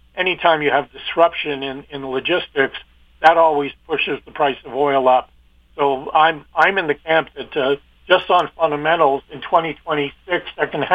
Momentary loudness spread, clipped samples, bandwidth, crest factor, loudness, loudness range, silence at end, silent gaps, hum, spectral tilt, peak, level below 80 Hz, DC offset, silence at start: 9 LU; under 0.1%; 7.6 kHz; 18 dB; -18 LUFS; 1 LU; 0 s; none; 60 Hz at -55 dBFS; -6 dB/octave; 0 dBFS; -52 dBFS; under 0.1%; 0.15 s